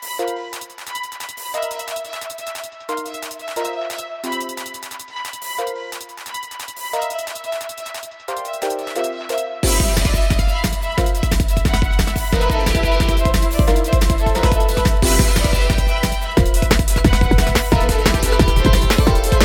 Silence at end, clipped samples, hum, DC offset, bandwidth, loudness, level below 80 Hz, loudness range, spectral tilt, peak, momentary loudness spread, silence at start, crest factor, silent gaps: 0 s; under 0.1%; none; under 0.1%; 18 kHz; -19 LUFS; -20 dBFS; 11 LU; -4.5 dB/octave; 0 dBFS; 14 LU; 0 s; 16 dB; none